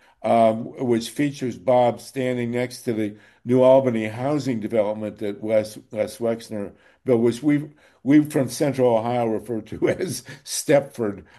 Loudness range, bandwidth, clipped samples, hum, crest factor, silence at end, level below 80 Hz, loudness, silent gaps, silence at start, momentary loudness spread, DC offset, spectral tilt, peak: 3 LU; 12.5 kHz; under 0.1%; none; 18 dB; 0.15 s; -62 dBFS; -22 LUFS; none; 0.25 s; 12 LU; under 0.1%; -6 dB/octave; -4 dBFS